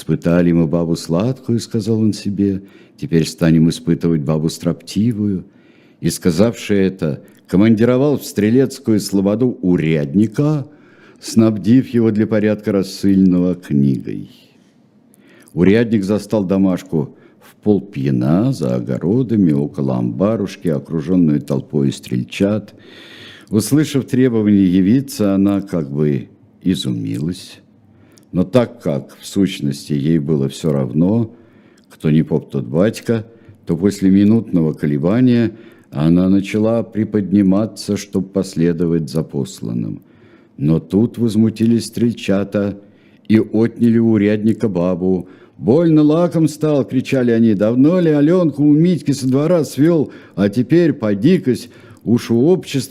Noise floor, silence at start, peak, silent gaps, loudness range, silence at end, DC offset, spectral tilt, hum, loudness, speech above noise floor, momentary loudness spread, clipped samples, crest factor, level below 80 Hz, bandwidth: -51 dBFS; 0 s; 0 dBFS; none; 4 LU; 0 s; under 0.1%; -7.5 dB/octave; none; -16 LUFS; 36 dB; 10 LU; under 0.1%; 16 dB; -52 dBFS; 15 kHz